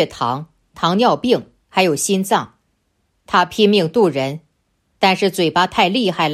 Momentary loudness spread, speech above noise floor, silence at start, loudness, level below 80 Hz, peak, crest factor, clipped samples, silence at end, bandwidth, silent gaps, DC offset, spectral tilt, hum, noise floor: 8 LU; 50 dB; 0 s; -17 LUFS; -56 dBFS; 0 dBFS; 16 dB; under 0.1%; 0 s; 15.5 kHz; none; under 0.1%; -4.5 dB/octave; none; -66 dBFS